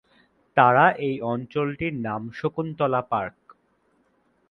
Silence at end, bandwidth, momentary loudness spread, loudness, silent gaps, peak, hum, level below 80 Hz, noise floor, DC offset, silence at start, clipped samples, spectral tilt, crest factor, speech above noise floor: 1.2 s; 6 kHz; 12 LU; -23 LUFS; none; -2 dBFS; none; -60 dBFS; -66 dBFS; under 0.1%; 0.55 s; under 0.1%; -8.5 dB/octave; 24 dB; 43 dB